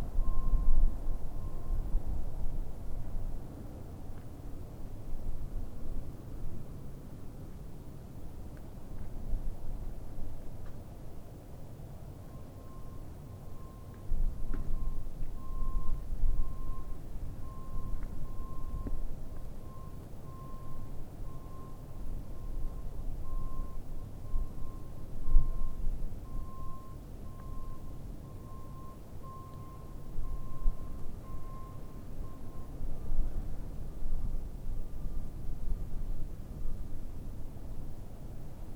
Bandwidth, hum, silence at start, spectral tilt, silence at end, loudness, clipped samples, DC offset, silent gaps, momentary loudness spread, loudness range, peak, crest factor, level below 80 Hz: 1.9 kHz; none; 0 s; -7.5 dB/octave; 0 s; -44 LUFS; under 0.1%; under 0.1%; none; 9 LU; 6 LU; -8 dBFS; 22 dB; -34 dBFS